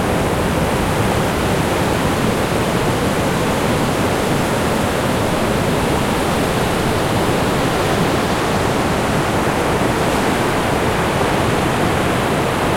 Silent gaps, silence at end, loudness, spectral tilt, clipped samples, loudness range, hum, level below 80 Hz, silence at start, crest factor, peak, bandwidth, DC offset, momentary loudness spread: none; 0 s; -17 LUFS; -5 dB/octave; under 0.1%; 0 LU; none; -32 dBFS; 0 s; 14 dB; -4 dBFS; 16.5 kHz; under 0.1%; 1 LU